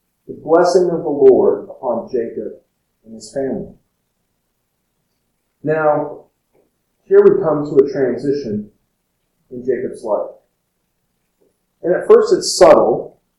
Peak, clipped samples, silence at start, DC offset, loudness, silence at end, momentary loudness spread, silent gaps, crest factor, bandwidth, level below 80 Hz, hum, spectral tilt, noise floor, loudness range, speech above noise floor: 0 dBFS; 0.2%; 0.3 s; under 0.1%; -15 LUFS; 0.3 s; 18 LU; none; 16 dB; 12 kHz; -52 dBFS; none; -5 dB/octave; -69 dBFS; 12 LU; 55 dB